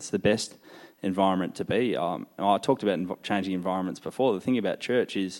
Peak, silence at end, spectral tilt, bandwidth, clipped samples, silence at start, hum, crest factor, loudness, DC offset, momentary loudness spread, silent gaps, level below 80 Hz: -8 dBFS; 0 s; -5.5 dB/octave; 16.5 kHz; under 0.1%; 0 s; none; 20 dB; -27 LUFS; under 0.1%; 6 LU; none; -68 dBFS